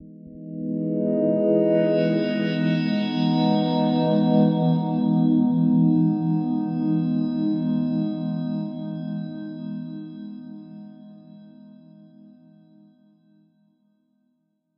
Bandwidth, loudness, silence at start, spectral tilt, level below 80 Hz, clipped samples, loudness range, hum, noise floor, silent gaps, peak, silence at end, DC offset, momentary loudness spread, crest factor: 5.6 kHz; -22 LUFS; 0 s; -10 dB/octave; -74 dBFS; under 0.1%; 17 LU; none; -71 dBFS; none; -6 dBFS; 3.05 s; under 0.1%; 18 LU; 18 dB